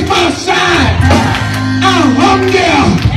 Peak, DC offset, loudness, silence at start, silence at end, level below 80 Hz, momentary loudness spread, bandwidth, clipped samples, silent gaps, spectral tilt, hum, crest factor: 0 dBFS; under 0.1%; -9 LUFS; 0 s; 0 s; -26 dBFS; 3 LU; 13.5 kHz; under 0.1%; none; -5 dB/octave; none; 10 dB